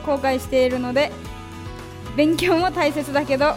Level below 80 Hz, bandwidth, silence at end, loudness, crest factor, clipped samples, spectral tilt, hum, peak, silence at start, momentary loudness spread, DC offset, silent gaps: -42 dBFS; 16.5 kHz; 0 s; -20 LUFS; 16 dB; under 0.1%; -5 dB/octave; none; -4 dBFS; 0 s; 17 LU; under 0.1%; none